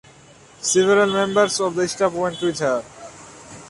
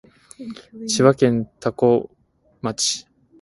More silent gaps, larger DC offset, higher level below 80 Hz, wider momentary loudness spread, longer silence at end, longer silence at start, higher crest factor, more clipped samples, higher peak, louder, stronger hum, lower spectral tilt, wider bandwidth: neither; neither; about the same, -58 dBFS vs -58 dBFS; first, 23 LU vs 20 LU; second, 0 s vs 0.4 s; first, 0.6 s vs 0.4 s; about the same, 18 dB vs 20 dB; neither; second, -4 dBFS vs 0 dBFS; about the same, -19 LUFS vs -20 LUFS; neither; about the same, -3.5 dB/octave vs -4.5 dB/octave; about the same, 11.5 kHz vs 11.5 kHz